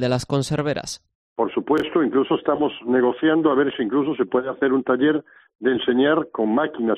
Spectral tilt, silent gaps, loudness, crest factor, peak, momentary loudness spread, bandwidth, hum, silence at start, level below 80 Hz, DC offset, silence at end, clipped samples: -6 dB/octave; 1.15-1.36 s, 5.55-5.59 s; -21 LUFS; 16 dB; -6 dBFS; 7 LU; 12.5 kHz; none; 0 s; -56 dBFS; under 0.1%; 0 s; under 0.1%